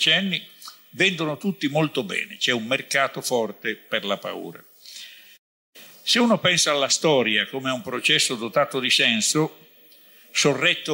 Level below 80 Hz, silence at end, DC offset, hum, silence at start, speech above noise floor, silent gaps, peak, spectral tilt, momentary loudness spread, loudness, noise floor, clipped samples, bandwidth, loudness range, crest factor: -72 dBFS; 0 s; under 0.1%; none; 0 s; 29 dB; 5.39-5.73 s; -6 dBFS; -2.5 dB/octave; 17 LU; -21 LUFS; -52 dBFS; under 0.1%; 16 kHz; 7 LU; 18 dB